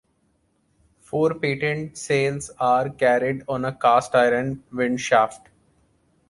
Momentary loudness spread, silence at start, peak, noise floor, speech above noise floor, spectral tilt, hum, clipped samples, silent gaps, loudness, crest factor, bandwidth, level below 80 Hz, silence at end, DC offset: 7 LU; 1.15 s; -4 dBFS; -67 dBFS; 45 dB; -5 dB/octave; none; under 0.1%; none; -22 LUFS; 18 dB; 11.5 kHz; -58 dBFS; 0.95 s; under 0.1%